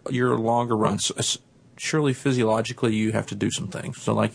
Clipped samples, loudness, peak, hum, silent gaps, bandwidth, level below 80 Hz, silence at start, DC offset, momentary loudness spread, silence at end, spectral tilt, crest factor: under 0.1%; -24 LUFS; -6 dBFS; none; none; 11 kHz; -60 dBFS; 0.05 s; under 0.1%; 8 LU; 0 s; -4.5 dB/octave; 18 dB